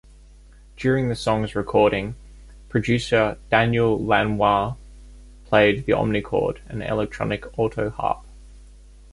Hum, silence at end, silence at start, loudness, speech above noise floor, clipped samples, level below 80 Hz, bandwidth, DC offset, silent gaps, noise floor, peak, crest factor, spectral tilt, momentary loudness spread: none; 0.45 s; 0.75 s; -22 LUFS; 26 dB; under 0.1%; -42 dBFS; 11.5 kHz; under 0.1%; none; -47 dBFS; -2 dBFS; 20 dB; -6.5 dB/octave; 9 LU